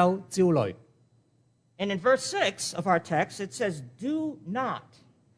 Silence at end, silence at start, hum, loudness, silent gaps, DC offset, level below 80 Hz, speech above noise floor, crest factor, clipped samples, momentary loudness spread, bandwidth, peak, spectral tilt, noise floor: 0.55 s; 0 s; none; -28 LUFS; none; under 0.1%; -70 dBFS; 39 dB; 20 dB; under 0.1%; 9 LU; 11 kHz; -8 dBFS; -5 dB/octave; -67 dBFS